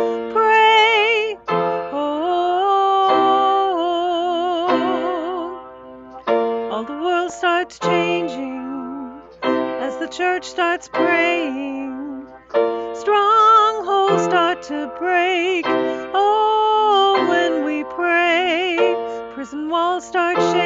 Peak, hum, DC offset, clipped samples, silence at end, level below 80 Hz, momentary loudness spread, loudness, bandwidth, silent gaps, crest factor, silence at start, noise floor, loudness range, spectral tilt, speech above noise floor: -4 dBFS; none; under 0.1%; under 0.1%; 0 s; -60 dBFS; 14 LU; -18 LUFS; 8 kHz; none; 14 dB; 0 s; -38 dBFS; 5 LU; -4 dB/octave; 19 dB